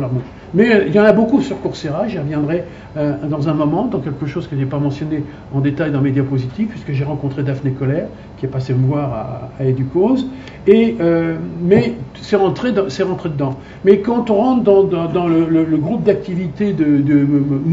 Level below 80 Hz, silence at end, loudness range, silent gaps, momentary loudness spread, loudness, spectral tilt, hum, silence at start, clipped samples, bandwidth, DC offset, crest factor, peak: -44 dBFS; 0 s; 5 LU; none; 10 LU; -16 LUFS; -8.5 dB/octave; none; 0 s; under 0.1%; 7.8 kHz; under 0.1%; 16 dB; 0 dBFS